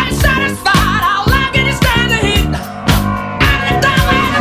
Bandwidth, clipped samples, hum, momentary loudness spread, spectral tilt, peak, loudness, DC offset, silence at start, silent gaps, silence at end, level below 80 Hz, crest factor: 16 kHz; under 0.1%; none; 4 LU; -4.5 dB/octave; 0 dBFS; -12 LUFS; under 0.1%; 0 s; none; 0 s; -20 dBFS; 12 dB